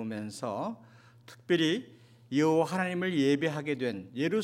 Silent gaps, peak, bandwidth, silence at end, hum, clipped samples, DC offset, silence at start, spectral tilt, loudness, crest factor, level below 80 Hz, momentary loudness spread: none; -14 dBFS; 15 kHz; 0 s; none; under 0.1%; under 0.1%; 0 s; -5.5 dB/octave; -30 LUFS; 16 dB; -80 dBFS; 10 LU